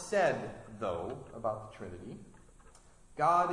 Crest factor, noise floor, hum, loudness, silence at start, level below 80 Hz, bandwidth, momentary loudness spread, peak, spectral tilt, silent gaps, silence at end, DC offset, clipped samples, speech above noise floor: 20 dB; -58 dBFS; none; -34 LUFS; 0 s; -62 dBFS; 11.5 kHz; 19 LU; -14 dBFS; -5 dB/octave; none; 0 s; under 0.1%; under 0.1%; 25 dB